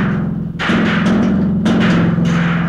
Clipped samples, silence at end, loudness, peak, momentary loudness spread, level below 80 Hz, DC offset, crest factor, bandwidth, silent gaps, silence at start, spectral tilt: under 0.1%; 0 s; -14 LUFS; -4 dBFS; 6 LU; -36 dBFS; 0.4%; 10 dB; 8.6 kHz; none; 0 s; -7 dB/octave